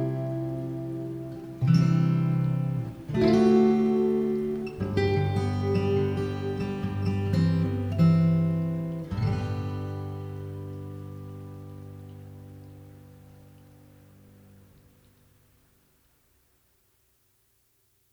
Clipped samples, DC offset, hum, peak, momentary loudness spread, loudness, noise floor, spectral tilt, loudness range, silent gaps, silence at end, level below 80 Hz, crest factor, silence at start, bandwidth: under 0.1%; under 0.1%; none; -10 dBFS; 21 LU; -26 LUFS; -68 dBFS; -9 dB/octave; 19 LU; none; 4.95 s; -52 dBFS; 18 dB; 0 s; 9.2 kHz